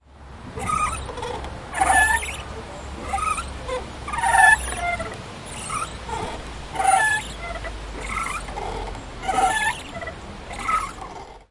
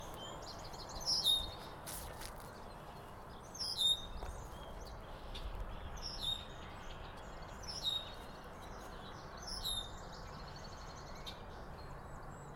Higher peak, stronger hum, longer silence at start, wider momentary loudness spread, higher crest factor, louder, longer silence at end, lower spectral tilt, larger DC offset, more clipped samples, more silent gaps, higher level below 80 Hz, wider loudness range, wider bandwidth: first, -2 dBFS vs -22 dBFS; neither; about the same, 0.1 s vs 0 s; about the same, 17 LU vs 18 LU; about the same, 22 dB vs 22 dB; first, -23 LUFS vs -41 LUFS; about the same, 0.05 s vs 0 s; about the same, -2.5 dB/octave vs -2.5 dB/octave; neither; neither; neither; first, -38 dBFS vs -52 dBFS; about the same, 5 LU vs 7 LU; second, 11.5 kHz vs 19 kHz